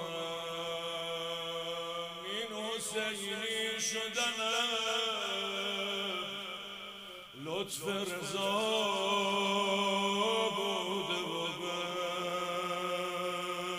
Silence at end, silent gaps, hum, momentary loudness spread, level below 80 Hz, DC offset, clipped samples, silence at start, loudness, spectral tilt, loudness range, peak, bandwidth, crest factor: 0 s; none; none; 8 LU; -76 dBFS; under 0.1%; under 0.1%; 0 s; -34 LUFS; -2.5 dB/octave; 5 LU; -20 dBFS; 15.5 kHz; 16 dB